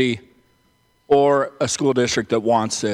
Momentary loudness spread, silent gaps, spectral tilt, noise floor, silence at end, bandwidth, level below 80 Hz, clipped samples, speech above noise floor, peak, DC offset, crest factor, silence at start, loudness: 6 LU; none; -4 dB/octave; -61 dBFS; 0 s; 12.5 kHz; -56 dBFS; under 0.1%; 43 dB; -4 dBFS; under 0.1%; 16 dB; 0 s; -19 LUFS